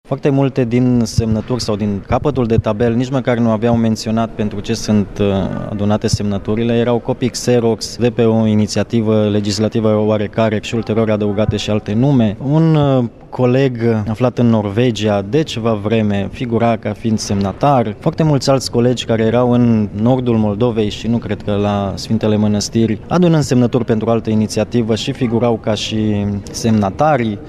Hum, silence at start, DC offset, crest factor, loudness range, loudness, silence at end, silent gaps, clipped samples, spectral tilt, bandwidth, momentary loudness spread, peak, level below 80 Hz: none; 0.1 s; under 0.1%; 14 dB; 2 LU; -15 LUFS; 0 s; none; under 0.1%; -6.5 dB/octave; 13 kHz; 5 LU; 0 dBFS; -38 dBFS